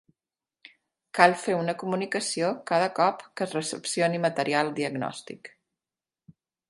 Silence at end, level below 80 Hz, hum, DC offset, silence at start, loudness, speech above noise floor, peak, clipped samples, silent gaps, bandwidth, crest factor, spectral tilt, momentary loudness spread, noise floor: 0.4 s; -74 dBFS; none; under 0.1%; 1.15 s; -26 LUFS; over 64 dB; -2 dBFS; under 0.1%; none; 11.5 kHz; 26 dB; -4 dB/octave; 13 LU; under -90 dBFS